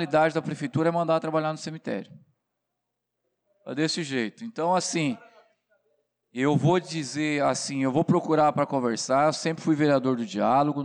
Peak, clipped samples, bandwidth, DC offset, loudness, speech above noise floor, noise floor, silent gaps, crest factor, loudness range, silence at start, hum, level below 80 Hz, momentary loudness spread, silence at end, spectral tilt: -12 dBFS; under 0.1%; 10.5 kHz; under 0.1%; -25 LUFS; 58 dB; -83 dBFS; none; 14 dB; 7 LU; 0 s; none; -70 dBFS; 10 LU; 0 s; -5.5 dB/octave